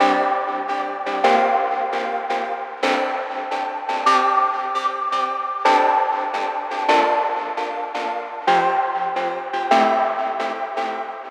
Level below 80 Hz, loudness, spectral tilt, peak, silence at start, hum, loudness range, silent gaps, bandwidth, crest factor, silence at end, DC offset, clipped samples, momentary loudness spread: -84 dBFS; -20 LUFS; -3 dB/octave; -2 dBFS; 0 s; none; 2 LU; none; 11 kHz; 18 dB; 0 s; under 0.1%; under 0.1%; 9 LU